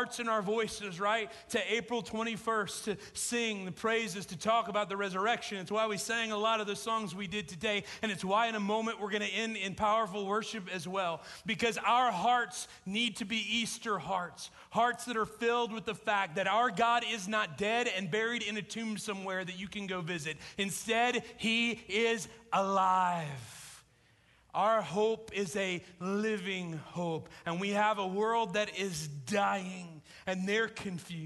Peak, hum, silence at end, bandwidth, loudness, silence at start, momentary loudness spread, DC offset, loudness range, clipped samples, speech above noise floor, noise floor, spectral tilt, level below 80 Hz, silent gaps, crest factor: -18 dBFS; none; 0 s; 12 kHz; -33 LUFS; 0 s; 9 LU; under 0.1%; 3 LU; under 0.1%; 32 dB; -66 dBFS; -3.5 dB/octave; -68 dBFS; none; 16 dB